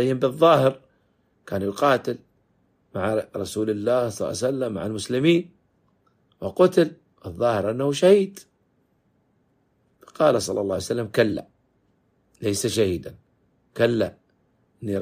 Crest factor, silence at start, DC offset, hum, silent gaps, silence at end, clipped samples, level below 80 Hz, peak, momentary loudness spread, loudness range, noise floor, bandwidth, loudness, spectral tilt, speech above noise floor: 20 dB; 0 s; under 0.1%; none; none; 0 s; under 0.1%; -60 dBFS; -4 dBFS; 15 LU; 4 LU; -67 dBFS; 15.5 kHz; -23 LUFS; -5.5 dB/octave; 45 dB